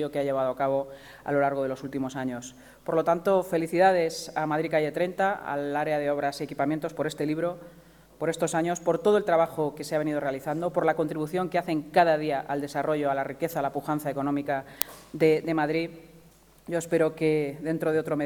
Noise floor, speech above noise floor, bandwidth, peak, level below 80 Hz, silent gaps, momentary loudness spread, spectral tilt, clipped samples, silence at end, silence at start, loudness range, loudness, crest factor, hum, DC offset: -55 dBFS; 29 dB; 19.5 kHz; 0 dBFS; -62 dBFS; none; 9 LU; -5.5 dB/octave; under 0.1%; 0 s; 0 s; 3 LU; -27 LUFS; 28 dB; none; under 0.1%